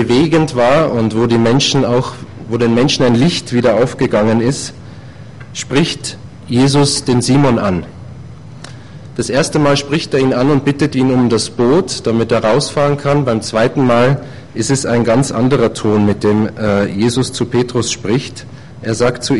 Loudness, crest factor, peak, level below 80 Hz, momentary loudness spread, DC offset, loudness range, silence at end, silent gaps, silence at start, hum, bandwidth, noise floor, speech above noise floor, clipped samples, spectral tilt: -13 LUFS; 12 dB; -2 dBFS; -40 dBFS; 16 LU; under 0.1%; 3 LU; 0 s; none; 0 s; none; 11.5 kHz; -33 dBFS; 20 dB; under 0.1%; -5.5 dB/octave